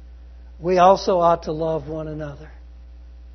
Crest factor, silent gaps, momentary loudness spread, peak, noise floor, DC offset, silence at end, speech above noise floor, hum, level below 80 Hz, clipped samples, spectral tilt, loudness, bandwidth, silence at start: 20 dB; none; 18 LU; -2 dBFS; -41 dBFS; under 0.1%; 0 s; 22 dB; none; -40 dBFS; under 0.1%; -6.5 dB/octave; -19 LUFS; 6.4 kHz; 0 s